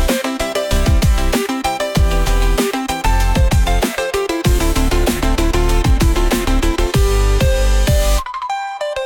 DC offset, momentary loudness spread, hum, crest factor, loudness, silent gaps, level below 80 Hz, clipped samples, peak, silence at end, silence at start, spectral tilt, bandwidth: under 0.1%; 4 LU; none; 10 dB; -17 LUFS; none; -16 dBFS; under 0.1%; -4 dBFS; 0 s; 0 s; -5 dB/octave; 18.5 kHz